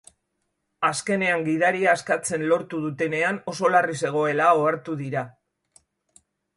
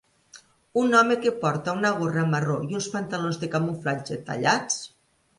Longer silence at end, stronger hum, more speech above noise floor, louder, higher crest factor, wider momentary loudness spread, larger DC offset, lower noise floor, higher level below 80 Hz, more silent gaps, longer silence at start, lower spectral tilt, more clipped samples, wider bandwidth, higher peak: first, 1.25 s vs 0.5 s; neither; first, 54 dB vs 29 dB; about the same, -23 LUFS vs -25 LUFS; about the same, 18 dB vs 20 dB; about the same, 10 LU vs 10 LU; neither; first, -76 dBFS vs -53 dBFS; about the same, -70 dBFS vs -66 dBFS; neither; first, 0.8 s vs 0.35 s; about the same, -4.5 dB/octave vs -5 dB/octave; neither; about the same, 11.5 kHz vs 11.5 kHz; about the same, -6 dBFS vs -6 dBFS